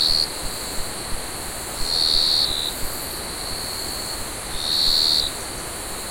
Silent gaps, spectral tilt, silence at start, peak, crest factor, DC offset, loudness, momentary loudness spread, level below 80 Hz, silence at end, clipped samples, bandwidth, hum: none; -1 dB/octave; 0 s; -4 dBFS; 18 dB; under 0.1%; -21 LUFS; 13 LU; -38 dBFS; 0 s; under 0.1%; 16.5 kHz; none